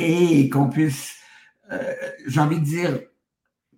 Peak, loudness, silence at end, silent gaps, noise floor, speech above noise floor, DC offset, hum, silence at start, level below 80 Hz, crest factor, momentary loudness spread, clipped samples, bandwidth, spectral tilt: -6 dBFS; -21 LUFS; 0.75 s; none; -80 dBFS; 60 dB; under 0.1%; none; 0 s; -64 dBFS; 16 dB; 15 LU; under 0.1%; 17 kHz; -6.5 dB/octave